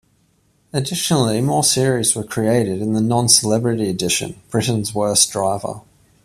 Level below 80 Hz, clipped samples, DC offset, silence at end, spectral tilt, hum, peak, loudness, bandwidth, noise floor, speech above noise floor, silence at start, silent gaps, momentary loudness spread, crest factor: -52 dBFS; under 0.1%; under 0.1%; 0.45 s; -4 dB/octave; none; 0 dBFS; -17 LUFS; 15.5 kHz; -60 dBFS; 42 dB; 0.75 s; none; 10 LU; 18 dB